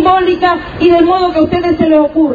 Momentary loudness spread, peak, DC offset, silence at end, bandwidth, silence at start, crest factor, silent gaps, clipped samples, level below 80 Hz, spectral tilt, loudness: 3 LU; 0 dBFS; under 0.1%; 0 s; 7 kHz; 0 s; 10 dB; none; under 0.1%; -36 dBFS; -7.5 dB/octave; -10 LUFS